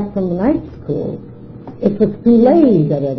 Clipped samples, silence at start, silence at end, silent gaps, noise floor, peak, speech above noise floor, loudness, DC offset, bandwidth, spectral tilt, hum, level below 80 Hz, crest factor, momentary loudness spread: under 0.1%; 0 s; 0 s; none; -33 dBFS; 0 dBFS; 19 dB; -14 LUFS; under 0.1%; 5.4 kHz; -11.5 dB/octave; none; -42 dBFS; 14 dB; 22 LU